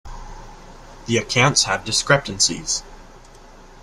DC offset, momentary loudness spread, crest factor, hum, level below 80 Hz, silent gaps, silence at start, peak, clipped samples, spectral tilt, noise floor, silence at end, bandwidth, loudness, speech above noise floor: under 0.1%; 23 LU; 22 dB; none; -42 dBFS; none; 0.05 s; 0 dBFS; under 0.1%; -2.5 dB/octave; -44 dBFS; 0.1 s; 13.5 kHz; -18 LUFS; 24 dB